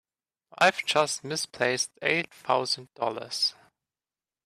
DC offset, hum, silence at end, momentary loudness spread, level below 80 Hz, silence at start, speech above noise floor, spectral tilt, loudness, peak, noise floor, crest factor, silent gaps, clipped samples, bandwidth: under 0.1%; none; 0.95 s; 7 LU; -74 dBFS; 0.6 s; over 62 dB; -2 dB/octave; -27 LUFS; -8 dBFS; under -90 dBFS; 22 dB; none; under 0.1%; 15 kHz